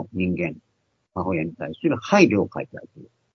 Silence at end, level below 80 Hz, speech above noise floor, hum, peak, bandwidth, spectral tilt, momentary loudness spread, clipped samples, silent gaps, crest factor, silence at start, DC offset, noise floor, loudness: 0.3 s; -58 dBFS; 48 dB; none; -2 dBFS; 6.6 kHz; -6.5 dB/octave; 18 LU; under 0.1%; none; 22 dB; 0 s; under 0.1%; -71 dBFS; -22 LUFS